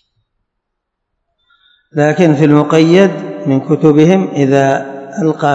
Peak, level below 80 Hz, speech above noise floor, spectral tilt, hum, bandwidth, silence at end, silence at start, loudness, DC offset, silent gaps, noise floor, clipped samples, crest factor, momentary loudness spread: 0 dBFS; -58 dBFS; 64 dB; -7.5 dB/octave; none; 8 kHz; 0 s; 1.95 s; -11 LUFS; under 0.1%; none; -73 dBFS; 0.7%; 12 dB; 9 LU